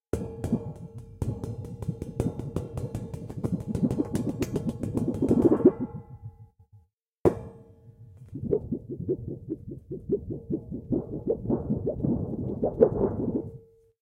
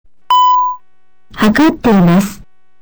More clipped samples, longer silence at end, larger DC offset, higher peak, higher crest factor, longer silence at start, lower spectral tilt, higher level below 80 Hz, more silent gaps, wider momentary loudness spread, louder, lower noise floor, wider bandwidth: neither; about the same, 0.35 s vs 0.45 s; second, under 0.1% vs 1%; about the same, -4 dBFS vs -4 dBFS; first, 24 dB vs 8 dB; second, 0.15 s vs 0.3 s; first, -9 dB/octave vs -6 dB/octave; second, -46 dBFS vs -38 dBFS; first, 6.93-6.97 s vs none; first, 16 LU vs 10 LU; second, -29 LUFS vs -11 LUFS; about the same, -61 dBFS vs -62 dBFS; second, 16 kHz vs over 20 kHz